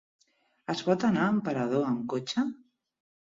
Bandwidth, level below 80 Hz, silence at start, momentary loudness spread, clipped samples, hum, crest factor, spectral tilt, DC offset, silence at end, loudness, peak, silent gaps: 7.8 kHz; -68 dBFS; 0.7 s; 10 LU; under 0.1%; none; 20 dB; -6 dB/octave; under 0.1%; 0.7 s; -29 LUFS; -12 dBFS; none